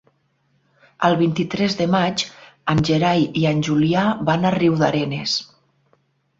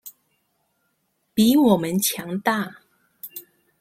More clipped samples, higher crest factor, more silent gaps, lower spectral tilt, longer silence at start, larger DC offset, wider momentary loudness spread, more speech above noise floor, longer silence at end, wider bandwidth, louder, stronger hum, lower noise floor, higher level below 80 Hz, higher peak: neither; about the same, 18 dB vs 20 dB; neither; first, -6 dB/octave vs -4.5 dB/octave; first, 1 s vs 0.05 s; neither; second, 5 LU vs 22 LU; second, 46 dB vs 52 dB; first, 0.95 s vs 0.4 s; second, 7.8 kHz vs 16.5 kHz; about the same, -19 LUFS vs -20 LUFS; neither; second, -65 dBFS vs -71 dBFS; first, -52 dBFS vs -62 dBFS; about the same, -2 dBFS vs -4 dBFS